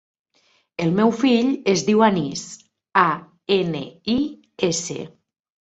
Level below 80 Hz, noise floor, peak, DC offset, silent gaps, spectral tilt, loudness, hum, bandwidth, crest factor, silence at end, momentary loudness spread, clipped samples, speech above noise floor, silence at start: -60 dBFS; -63 dBFS; -2 dBFS; under 0.1%; none; -5 dB/octave; -21 LUFS; none; 8.2 kHz; 20 dB; 0.6 s; 14 LU; under 0.1%; 43 dB; 0.8 s